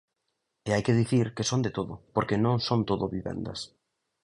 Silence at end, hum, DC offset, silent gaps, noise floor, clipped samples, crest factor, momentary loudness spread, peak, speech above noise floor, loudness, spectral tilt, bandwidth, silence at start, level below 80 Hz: 0.6 s; none; under 0.1%; none; -80 dBFS; under 0.1%; 18 dB; 12 LU; -10 dBFS; 53 dB; -28 LUFS; -6 dB/octave; 11 kHz; 0.65 s; -54 dBFS